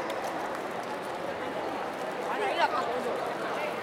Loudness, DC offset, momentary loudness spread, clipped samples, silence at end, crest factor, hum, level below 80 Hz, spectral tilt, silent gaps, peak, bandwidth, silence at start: -32 LUFS; under 0.1%; 7 LU; under 0.1%; 0 s; 18 dB; none; -68 dBFS; -4 dB/octave; none; -14 dBFS; 16.5 kHz; 0 s